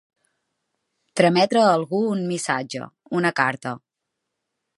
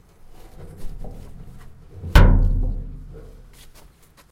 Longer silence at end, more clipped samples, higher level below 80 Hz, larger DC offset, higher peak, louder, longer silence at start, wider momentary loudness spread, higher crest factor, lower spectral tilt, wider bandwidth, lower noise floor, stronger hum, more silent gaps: about the same, 1 s vs 1.1 s; neither; second, -74 dBFS vs -22 dBFS; neither; about the same, -2 dBFS vs 0 dBFS; about the same, -21 LUFS vs -20 LUFS; first, 1.15 s vs 0.6 s; second, 15 LU vs 28 LU; about the same, 20 dB vs 22 dB; second, -5 dB/octave vs -6.5 dB/octave; about the same, 11.5 kHz vs 12.5 kHz; first, -81 dBFS vs -50 dBFS; neither; neither